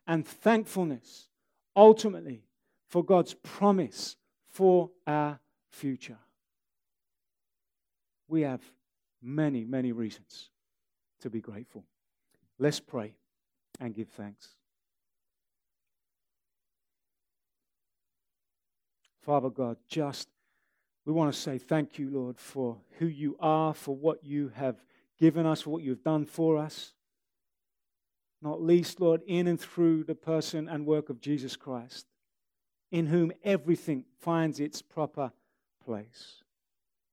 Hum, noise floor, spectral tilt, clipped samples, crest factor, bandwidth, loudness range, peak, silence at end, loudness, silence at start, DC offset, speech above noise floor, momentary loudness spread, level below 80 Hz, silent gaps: none; under -90 dBFS; -6.5 dB/octave; under 0.1%; 26 dB; 16.5 kHz; 12 LU; -6 dBFS; 0.8 s; -29 LUFS; 0.05 s; under 0.1%; over 61 dB; 17 LU; -82 dBFS; none